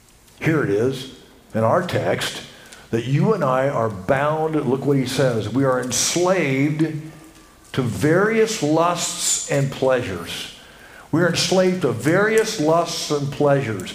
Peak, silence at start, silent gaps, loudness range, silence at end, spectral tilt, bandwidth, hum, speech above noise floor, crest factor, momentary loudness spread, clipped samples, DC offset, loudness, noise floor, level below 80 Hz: -4 dBFS; 0.4 s; none; 2 LU; 0 s; -4.5 dB/octave; 16 kHz; none; 27 dB; 16 dB; 9 LU; under 0.1%; under 0.1%; -20 LUFS; -46 dBFS; -54 dBFS